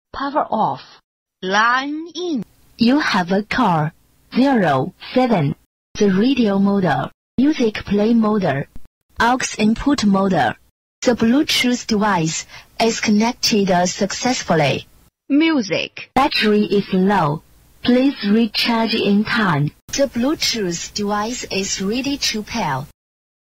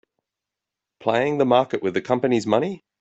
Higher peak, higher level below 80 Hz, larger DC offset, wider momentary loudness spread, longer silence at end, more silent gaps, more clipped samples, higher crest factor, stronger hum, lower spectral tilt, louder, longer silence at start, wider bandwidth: about the same, -2 dBFS vs -4 dBFS; first, -46 dBFS vs -64 dBFS; neither; about the same, 9 LU vs 7 LU; first, 0.6 s vs 0.25 s; first, 1.04-1.26 s, 5.66-5.95 s, 7.14-7.38 s, 8.87-9.09 s, 10.71-11.02 s, 19.82-19.88 s vs none; neither; about the same, 16 dB vs 20 dB; neither; second, -4.5 dB/octave vs -6 dB/octave; first, -18 LUFS vs -22 LUFS; second, 0.15 s vs 1 s; first, 16 kHz vs 8.2 kHz